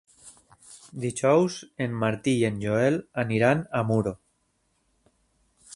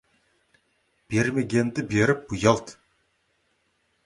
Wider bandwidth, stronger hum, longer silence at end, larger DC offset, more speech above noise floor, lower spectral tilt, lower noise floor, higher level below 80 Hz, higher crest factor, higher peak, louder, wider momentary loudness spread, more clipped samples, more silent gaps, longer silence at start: about the same, 11.5 kHz vs 11.5 kHz; neither; second, 0 s vs 1.35 s; neither; about the same, 47 dB vs 47 dB; about the same, -6 dB/octave vs -6 dB/octave; about the same, -71 dBFS vs -71 dBFS; second, -60 dBFS vs -54 dBFS; about the same, 20 dB vs 22 dB; second, -8 dBFS vs -4 dBFS; about the same, -25 LUFS vs -24 LUFS; first, 10 LU vs 5 LU; neither; neither; second, 0.25 s vs 1.1 s